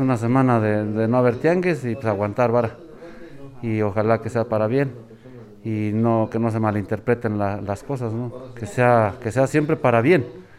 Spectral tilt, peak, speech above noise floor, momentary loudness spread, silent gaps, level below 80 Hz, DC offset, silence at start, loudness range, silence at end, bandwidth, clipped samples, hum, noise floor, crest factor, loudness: -8 dB/octave; -4 dBFS; 22 dB; 14 LU; none; -54 dBFS; under 0.1%; 0 s; 3 LU; 0.15 s; 12.5 kHz; under 0.1%; none; -42 dBFS; 16 dB; -21 LUFS